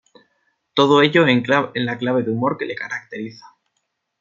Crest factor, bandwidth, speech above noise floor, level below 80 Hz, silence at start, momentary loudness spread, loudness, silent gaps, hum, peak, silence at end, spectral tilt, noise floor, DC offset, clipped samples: 18 dB; 7.4 kHz; 55 dB; -64 dBFS; 0.75 s; 15 LU; -18 LUFS; none; none; -2 dBFS; 0.85 s; -6 dB/octave; -74 dBFS; under 0.1%; under 0.1%